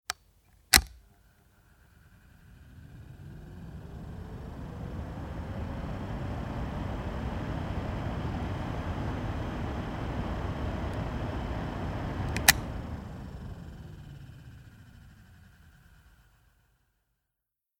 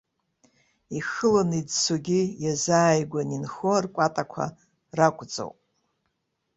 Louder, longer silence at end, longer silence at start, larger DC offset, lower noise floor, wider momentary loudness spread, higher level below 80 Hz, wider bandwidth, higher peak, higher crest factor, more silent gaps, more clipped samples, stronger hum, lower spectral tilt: second, -32 LUFS vs -25 LUFS; first, 1.6 s vs 1.05 s; second, 0.1 s vs 0.9 s; neither; first, -86 dBFS vs -77 dBFS; first, 25 LU vs 13 LU; first, -42 dBFS vs -64 dBFS; first, 19.5 kHz vs 8.2 kHz; first, 0 dBFS vs -4 dBFS; first, 34 dB vs 22 dB; neither; neither; neither; about the same, -3.5 dB/octave vs -4.5 dB/octave